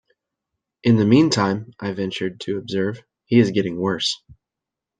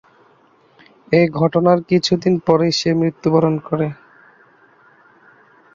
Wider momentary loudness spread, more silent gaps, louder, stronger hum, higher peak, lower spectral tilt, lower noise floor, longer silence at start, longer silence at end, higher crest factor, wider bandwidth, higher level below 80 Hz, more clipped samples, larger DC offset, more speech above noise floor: first, 12 LU vs 6 LU; neither; second, -20 LUFS vs -17 LUFS; neither; about the same, -2 dBFS vs 0 dBFS; about the same, -6 dB/octave vs -6.5 dB/octave; first, -86 dBFS vs -54 dBFS; second, 0.85 s vs 1.1 s; second, 0.65 s vs 1.8 s; about the same, 18 dB vs 18 dB; first, 9.4 kHz vs 7.6 kHz; about the same, -60 dBFS vs -56 dBFS; neither; neither; first, 66 dB vs 38 dB